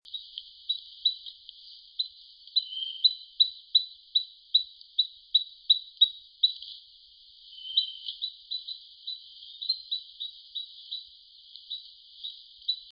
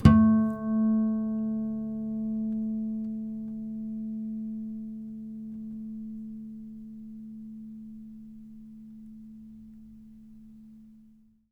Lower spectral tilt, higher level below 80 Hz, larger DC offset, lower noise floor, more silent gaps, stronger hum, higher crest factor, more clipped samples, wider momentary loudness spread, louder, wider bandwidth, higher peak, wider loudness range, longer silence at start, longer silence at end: second, 2 dB/octave vs -9.5 dB/octave; second, -78 dBFS vs -46 dBFS; neither; about the same, -55 dBFS vs -58 dBFS; neither; neither; about the same, 24 dB vs 26 dB; neither; second, 19 LU vs 23 LU; about the same, -28 LUFS vs -30 LUFS; about the same, 5.4 kHz vs 5.2 kHz; second, -10 dBFS vs -4 dBFS; second, 11 LU vs 17 LU; about the same, 0.05 s vs 0 s; second, 0 s vs 0.5 s